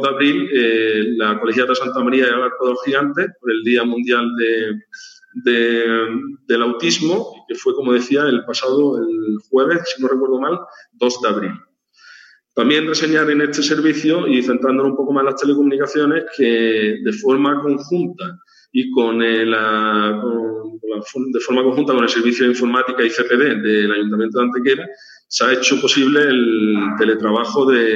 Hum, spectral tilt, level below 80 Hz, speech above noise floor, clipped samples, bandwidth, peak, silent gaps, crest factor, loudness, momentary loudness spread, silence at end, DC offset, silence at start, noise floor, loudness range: none; -4 dB/octave; -76 dBFS; 30 dB; under 0.1%; 8 kHz; -2 dBFS; none; 16 dB; -16 LUFS; 8 LU; 0 s; under 0.1%; 0 s; -46 dBFS; 3 LU